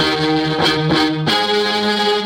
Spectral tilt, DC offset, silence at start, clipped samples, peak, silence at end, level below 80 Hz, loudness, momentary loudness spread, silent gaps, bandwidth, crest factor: -4.5 dB/octave; under 0.1%; 0 s; under 0.1%; -2 dBFS; 0 s; -46 dBFS; -15 LUFS; 1 LU; none; 16.5 kHz; 14 dB